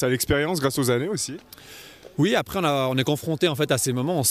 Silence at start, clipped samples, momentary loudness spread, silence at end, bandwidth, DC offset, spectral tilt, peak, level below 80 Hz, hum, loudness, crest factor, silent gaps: 0 s; under 0.1%; 18 LU; 0 s; 15.5 kHz; under 0.1%; -4.5 dB/octave; -8 dBFS; -50 dBFS; none; -23 LUFS; 16 dB; none